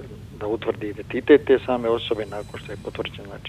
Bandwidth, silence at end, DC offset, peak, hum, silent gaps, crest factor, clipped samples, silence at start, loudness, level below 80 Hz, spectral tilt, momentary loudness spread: 11 kHz; 0 s; under 0.1%; -2 dBFS; none; none; 22 dB; under 0.1%; 0 s; -23 LUFS; -48 dBFS; -6.5 dB/octave; 17 LU